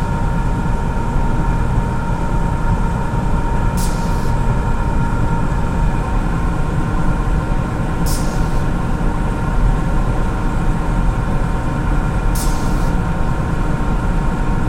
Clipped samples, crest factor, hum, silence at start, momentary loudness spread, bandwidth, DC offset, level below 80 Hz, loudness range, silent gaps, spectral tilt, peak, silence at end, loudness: under 0.1%; 12 dB; none; 0 s; 1 LU; 16 kHz; under 0.1%; -18 dBFS; 0 LU; none; -7 dB/octave; -2 dBFS; 0 s; -19 LUFS